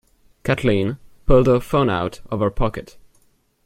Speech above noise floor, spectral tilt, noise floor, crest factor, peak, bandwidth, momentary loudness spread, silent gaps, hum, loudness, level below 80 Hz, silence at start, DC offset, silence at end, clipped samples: 41 dB; -7.5 dB/octave; -59 dBFS; 18 dB; -2 dBFS; 15 kHz; 12 LU; none; none; -20 LUFS; -32 dBFS; 0.45 s; under 0.1%; 0.8 s; under 0.1%